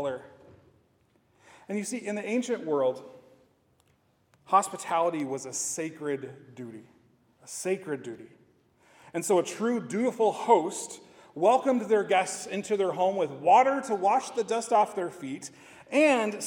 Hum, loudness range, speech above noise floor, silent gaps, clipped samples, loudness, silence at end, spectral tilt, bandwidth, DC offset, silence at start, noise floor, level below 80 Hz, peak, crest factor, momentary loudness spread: none; 8 LU; 40 dB; none; under 0.1%; -27 LUFS; 0 s; -4 dB/octave; 18 kHz; under 0.1%; 0 s; -68 dBFS; -80 dBFS; -8 dBFS; 20 dB; 18 LU